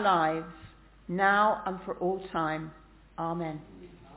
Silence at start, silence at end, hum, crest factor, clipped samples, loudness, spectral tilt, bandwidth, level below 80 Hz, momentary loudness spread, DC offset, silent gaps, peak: 0 s; 0 s; none; 18 dB; under 0.1%; -30 LUFS; -4 dB/octave; 4 kHz; -58 dBFS; 21 LU; under 0.1%; none; -12 dBFS